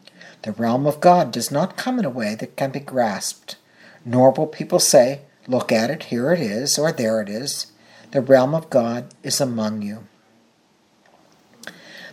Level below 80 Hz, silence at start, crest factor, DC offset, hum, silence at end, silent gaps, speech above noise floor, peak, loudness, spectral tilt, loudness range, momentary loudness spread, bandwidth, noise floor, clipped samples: -70 dBFS; 0.25 s; 20 dB; under 0.1%; none; 0 s; none; 40 dB; 0 dBFS; -20 LUFS; -4.5 dB/octave; 4 LU; 19 LU; 16 kHz; -59 dBFS; under 0.1%